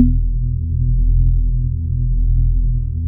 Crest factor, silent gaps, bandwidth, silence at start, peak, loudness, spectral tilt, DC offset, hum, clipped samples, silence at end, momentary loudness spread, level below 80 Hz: 14 dB; none; 0.5 kHz; 0 s; 0 dBFS; -19 LUFS; -18 dB/octave; under 0.1%; none; under 0.1%; 0 s; 4 LU; -16 dBFS